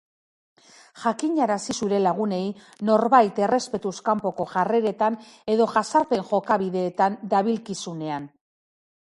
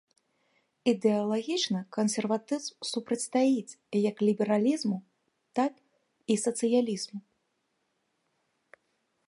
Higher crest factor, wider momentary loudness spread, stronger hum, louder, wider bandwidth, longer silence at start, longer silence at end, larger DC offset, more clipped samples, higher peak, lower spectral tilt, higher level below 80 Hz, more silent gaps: about the same, 22 dB vs 18 dB; about the same, 10 LU vs 9 LU; neither; first, -23 LUFS vs -29 LUFS; about the same, 11.5 kHz vs 11.5 kHz; about the same, 0.95 s vs 0.85 s; second, 0.95 s vs 2.05 s; neither; neither; first, -2 dBFS vs -12 dBFS; about the same, -5.5 dB/octave vs -4.5 dB/octave; first, -68 dBFS vs -80 dBFS; neither